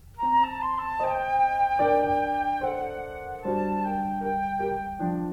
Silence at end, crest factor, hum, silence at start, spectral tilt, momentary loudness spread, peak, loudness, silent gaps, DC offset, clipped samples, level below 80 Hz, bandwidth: 0 s; 14 dB; none; 0.05 s; -7.5 dB/octave; 8 LU; -12 dBFS; -26 LUFS; none; under 0.1%; under 0.1%; -50 dBFS; 15 kHz